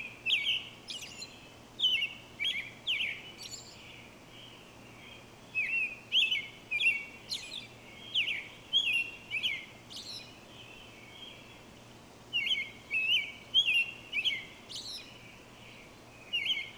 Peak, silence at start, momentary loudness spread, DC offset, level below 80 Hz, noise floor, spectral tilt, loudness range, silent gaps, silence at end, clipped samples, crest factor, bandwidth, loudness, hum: -16 dBFS; 0 s; 23 LU; under 0.1%; -68 dBFS; -53 dBFS; -0.5 dB/octave; 7 LU; none; 0 s; under 0.1%; 18 dB; over 20 kHz; -31 LUFS; none